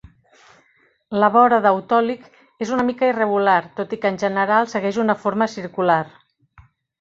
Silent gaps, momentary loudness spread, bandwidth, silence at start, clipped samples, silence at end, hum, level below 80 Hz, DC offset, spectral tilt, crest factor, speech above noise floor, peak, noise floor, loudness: none; 11 LU; 7.8 kHz; 1.1 s; under 0.1%; 0.9 s; none; -60 dBFS; under 0.1%; -6 dB/octave; 18 dB; 42 dB; -2 dBFS; -60 dBFS; -19 LUFS